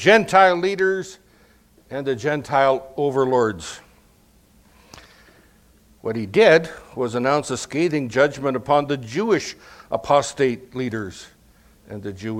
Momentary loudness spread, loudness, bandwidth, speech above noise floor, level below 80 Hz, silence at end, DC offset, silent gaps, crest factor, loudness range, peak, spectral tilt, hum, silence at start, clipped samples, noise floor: 19 LU; -20 LUFS; 15.5 kHz; 35 dB; -56 dBFS; 0 s; under 0.1%; none; 22 dB; 5 LU; 0 dBFS; -5 dB/octave; none; 0 s; under 0.1%; -55 dBFS